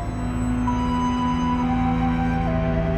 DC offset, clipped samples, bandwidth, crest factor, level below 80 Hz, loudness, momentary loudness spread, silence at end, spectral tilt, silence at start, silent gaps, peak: under 0.1%; under 0.1%; 8.4 kHz; 14 dB; -30 dBFS; -23 LUFS; 2 LU; 0 s; -7.5 dB/octave; 0 s; none; -8 dBFS